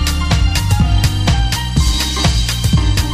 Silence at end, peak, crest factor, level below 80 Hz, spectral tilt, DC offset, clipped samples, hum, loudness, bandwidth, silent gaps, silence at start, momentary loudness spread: 0 s; 0 dBFS; 12 dB; -16 dBFS; -4.5 dB/octave; under 0.1%; under 0.1%; none; -15 LUFS; 15.5 kHz; none; 0 s; 2 LU